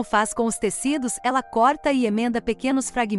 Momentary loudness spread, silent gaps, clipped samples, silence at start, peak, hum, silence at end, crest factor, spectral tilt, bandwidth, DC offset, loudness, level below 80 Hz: 4 LU; none; under 0.1%; 0 s; -8 dBFS; none; 0 s; 14 dB; -3.5 dB/octave; 13.5 kHz; under 0.1%; -22 LUFS; -50 dBFS